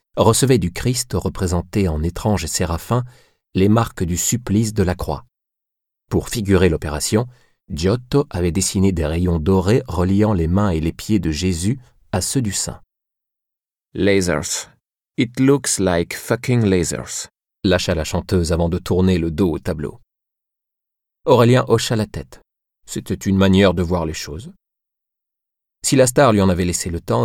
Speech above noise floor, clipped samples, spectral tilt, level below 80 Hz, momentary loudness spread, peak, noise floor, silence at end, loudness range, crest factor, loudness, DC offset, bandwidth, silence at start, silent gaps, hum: 69 dB; under 0.1%; -5.5 dB/octave; -36 dBFS; 12 LU; -2 dBFS; -87 dBFS; 0 s; 3 LU; 16 dB; -18 LUFS; under 0.1%; 17 kHz; 0.15 s; none; none